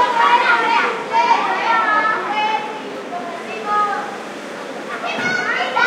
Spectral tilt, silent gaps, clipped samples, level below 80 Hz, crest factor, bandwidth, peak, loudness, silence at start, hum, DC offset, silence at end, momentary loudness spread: -2.5 dB/octave; none; under 0.1%; -76 dBFS; 16 dB; 13 kHz; -2 dBFS; -17 LUFS; 0 s; none; under 0.1%; 0 s; 14 LU